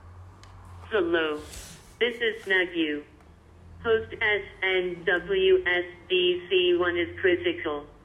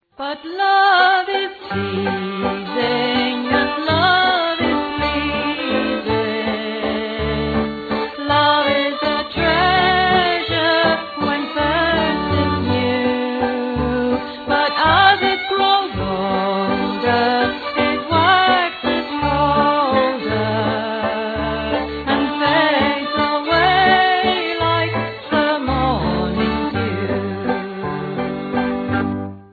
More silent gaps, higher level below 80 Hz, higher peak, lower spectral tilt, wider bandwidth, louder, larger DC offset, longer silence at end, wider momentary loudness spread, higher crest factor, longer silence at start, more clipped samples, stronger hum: neither; second, -54 dBFS vs -38 dBFS; second, -10 dBFS vs 0 dBFS; second, -4.5 dB/octave vs -7.5 dB/octave; first, 12.5 kHz vs 4.9 kHz; second, -26 LUFS vs -18 LUFS; neither; about the same, 0.15 s vs 0.1 s; about the same, 10 LU vs 8 LU; about the same, 16 dB vs 18 dB; second, 0.05 s vs 0.2 s; neither; neither